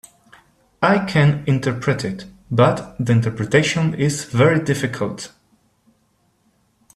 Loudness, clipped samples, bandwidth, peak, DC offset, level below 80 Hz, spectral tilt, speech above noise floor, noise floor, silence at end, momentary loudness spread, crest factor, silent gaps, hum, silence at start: -19 LUFS; under 0.1%; 13.5 kHz; -2 dBFS; under 0.1%; -52 dBFS; -6 dB/octave; 45 dB; -63 dBFS; 1.7 s; 10 LU; 18 dB; none; none; 0.8 s